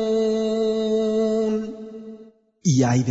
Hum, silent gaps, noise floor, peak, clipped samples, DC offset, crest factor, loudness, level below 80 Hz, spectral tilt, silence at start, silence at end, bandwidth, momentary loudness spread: none; none; -48 dBFS; -8 dBFS; under 0.1%; under 0.1%; 14 dB; -22 LUFS; -56 dBFS; -6.5 dB/octave; 0 s; 0 s; 8 kHz; 18 LU